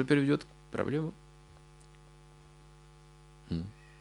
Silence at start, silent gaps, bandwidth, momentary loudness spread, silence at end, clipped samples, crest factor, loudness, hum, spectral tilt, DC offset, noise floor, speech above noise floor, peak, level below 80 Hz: 0 s; none; 11.5 kHz; 29 LU; 0.3 s; under 0.1%; 22 dB; -34 LUFS; none; -7.5 dB/octave; under 0.1%; -56 dBFS; 26 dB; -12 dBFS; -58 dBFS